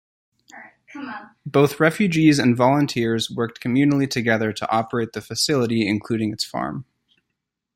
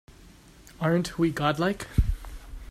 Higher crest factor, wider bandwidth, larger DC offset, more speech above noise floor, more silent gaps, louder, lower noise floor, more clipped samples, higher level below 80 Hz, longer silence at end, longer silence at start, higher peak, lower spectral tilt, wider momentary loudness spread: about the same, 18 dB vs 18 dB; about the same, 16 kHz vs 15.5 kHz; neither; first, 59 dB vs 26 dB; neither; first, -20 LUFS vs -27 LUFS; first, -80 dBFS vs -51 dBFS; neither; second, -60 dBFS vs -34 dBFS; first, 0.95 s vs 0 s; second, 0.55 s vs 0.7 s; first, -2 dBFS vs -10 dBFS; about the same, -5.5 dB/octave vs -6.5 dB/octave; about the same, 17 LU vs 15 LU